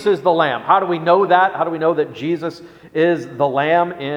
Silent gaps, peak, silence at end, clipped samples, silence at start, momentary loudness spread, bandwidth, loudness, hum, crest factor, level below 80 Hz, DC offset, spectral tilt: none; 0 dBFS; 0 s; under 0.1%; 0 s; 8 LU; 10.5 kHz; -17 LUFS; none; 16 dB; -64 dBFS; under 0.1%; -7 dB/octave